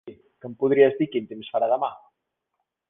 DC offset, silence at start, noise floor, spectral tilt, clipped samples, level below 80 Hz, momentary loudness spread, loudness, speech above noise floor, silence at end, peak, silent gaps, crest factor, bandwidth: under 0.1%; 0.05 s; -80 dBFS; -9.5 dB/octave; under 0.1%; -70 dBFS; 15 LU; -23 LUFS; 57 dB; 0.9 s; -4 dBFS; none; 20 dB; 3.8 kHz